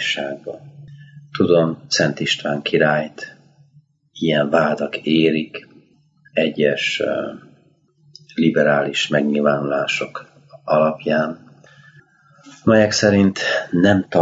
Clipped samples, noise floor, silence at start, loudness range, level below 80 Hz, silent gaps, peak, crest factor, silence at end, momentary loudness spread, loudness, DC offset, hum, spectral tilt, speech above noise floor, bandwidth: under 0.1%; -57 dBFS; 0 s; 3 LU; -60 dBFS; none; -2 dBFS; 18 dB; 0 s; 16 LU; -18 LUFS; under 0.1%; none; -5 dB/octave; 39 dB; 8 kHz